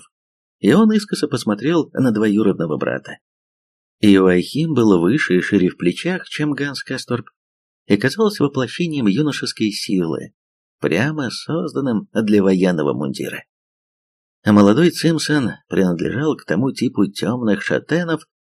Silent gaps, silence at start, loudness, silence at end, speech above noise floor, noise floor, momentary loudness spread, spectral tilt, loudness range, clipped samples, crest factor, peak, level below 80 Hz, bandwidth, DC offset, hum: 3.21-3.99 s, 7.36-7.86 s, 10.34-10.79 s, 13.49-14.43 s; 0.65 s; -18 LUFS; 0.25 s; over 73 dB; under -90 dBFS; 10 LU; -6 dB/octave; 4 LU; under 0.1%; 18 dB; 0 dBFS; -58 dBFS; 13.5 kHz; under 0.1%; none